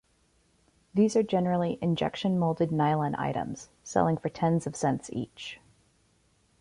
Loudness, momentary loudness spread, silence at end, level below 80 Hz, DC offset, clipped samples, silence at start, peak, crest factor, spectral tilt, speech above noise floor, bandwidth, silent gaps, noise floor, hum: -28 LUFS; 13 LU; 1.05 s; -60 dBFS; under 0.1%; under 0.1%; 0.95 s; -10 dBFS; 18 dB; -6.5 dB/octave; 40 dB; 11 kHz; none; -68 dBFS; none